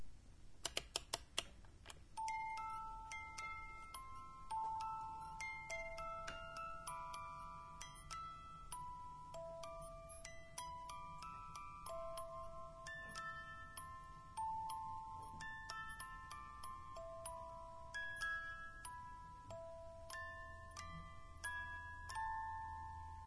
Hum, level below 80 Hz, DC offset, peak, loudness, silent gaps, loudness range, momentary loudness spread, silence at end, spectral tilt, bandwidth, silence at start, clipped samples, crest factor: none; -62 dBFS; under 0.1%; -22 dBFS; -50 LUFS; none; 4 LU; 9 LU; 0 s; -2 dB/octave; 11 kHz; 0 s; under 0.1%; 28 dB